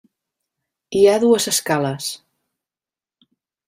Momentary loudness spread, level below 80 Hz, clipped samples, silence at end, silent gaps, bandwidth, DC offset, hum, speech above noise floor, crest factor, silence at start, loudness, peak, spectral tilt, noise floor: 14 LU; -62 dBFS; under 0.1%; 1.5 s; none; 16 kHz; under 0.1%; none; over 73 dB; 18 dB; 0.9 s; -17 LUFS; -2 dBFS; -3.5 dB/octave; under -90 dBFS